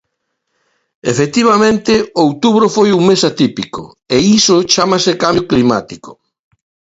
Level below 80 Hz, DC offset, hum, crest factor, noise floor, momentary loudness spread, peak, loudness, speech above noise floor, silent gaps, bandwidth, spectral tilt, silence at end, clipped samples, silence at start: -46 dBFS; under 0.1%; none; 12 dB; -71 dBFS; 12 LU; 0 dBFS; -11 LUFS; 59 dB; none; 8 kHz; -4.5 dB/octave; 0.8 s; under 0.1%; 1.05 s